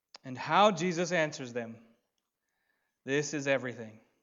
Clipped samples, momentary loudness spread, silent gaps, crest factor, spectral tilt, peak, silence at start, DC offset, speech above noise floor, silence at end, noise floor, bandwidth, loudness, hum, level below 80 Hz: under 0.1%; 20 LU; none; 22 dB; -4.5 dB/octave; -12 dBFS; 0.25 s; under 0.1%; 53 dB; 0.25 s; -84 dBFS; 7.8 kHz; -30 LUFS; none; -84 dBFS